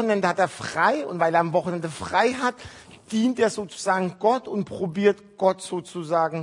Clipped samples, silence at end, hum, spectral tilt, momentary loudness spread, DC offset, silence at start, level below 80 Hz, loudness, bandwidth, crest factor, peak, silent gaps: under 0.1%; 0 s; none; -5 dB/octave; 9 LU; under 0.1%; 0 s; -64 dBFS; -24 LUFS; 11 kHz; 18 dB; -4 dBFS; none